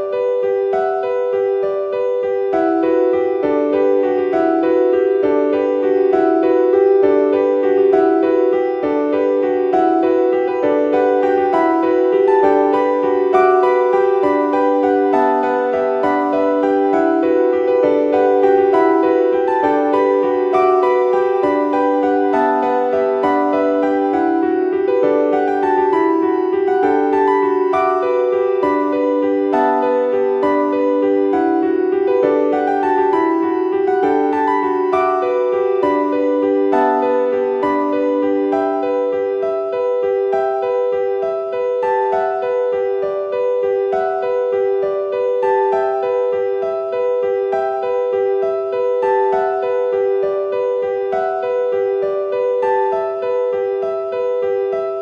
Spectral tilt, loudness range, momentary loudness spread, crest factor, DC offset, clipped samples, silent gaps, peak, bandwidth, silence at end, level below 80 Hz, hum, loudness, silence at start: -7 dB/octave; 4 LU; 5 LU; 14 dB; under 0.1%; under 0.1%; none; 0 dBFS; 6.4 kHz; 0 s; -60 dBFS; none; -16 LUFS; 0 s